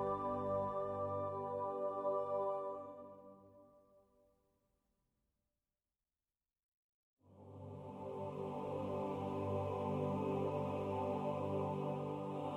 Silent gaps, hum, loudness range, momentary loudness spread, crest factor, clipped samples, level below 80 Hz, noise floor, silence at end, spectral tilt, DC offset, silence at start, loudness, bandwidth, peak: 6.63-7.17 s; none; 15 LU; 13 LU; 16 dB; under 0.1%; -74 dBFS; under -90 dBFS; 0 s; -9 dB/octave; under 0.1%; 0 s; -41 LUFS; 12.5 kHz; -26 dBFS